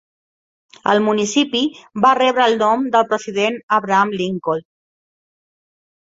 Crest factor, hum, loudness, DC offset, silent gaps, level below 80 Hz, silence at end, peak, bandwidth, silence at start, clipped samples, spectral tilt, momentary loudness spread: 18 dB; none; -17 LUFS; under 0.1%; 3.63-3.68 s; -64 dBFS; 1.5 s; -2 dBFS; 8 kHz; 0.85 s; under 0.1%; -4 dB/octave; 8 LU